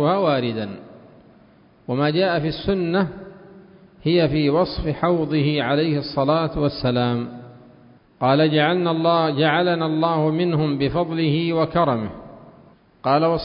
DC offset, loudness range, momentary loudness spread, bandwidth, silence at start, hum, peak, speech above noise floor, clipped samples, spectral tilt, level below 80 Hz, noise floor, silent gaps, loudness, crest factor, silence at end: under 0.1%; 4 LU; 10 LU; 5.4 kHz; 0 s; none; -4 dBFS; 33 dB; under 0.1%; -11.5 dB/octave; -46 dBFS; -52 dBFS; none; -20 LUFS; 16 dB; 0 s